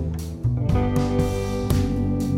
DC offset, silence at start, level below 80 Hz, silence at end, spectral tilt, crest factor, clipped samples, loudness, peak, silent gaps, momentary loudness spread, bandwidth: under 0.1%; 0 s; -30 dBFS; 0 s; -7.5 dB/octave; 16 dB; under 0.1%; -23 LUFS; -6 dBFS; none; 4 LU; 16 kHz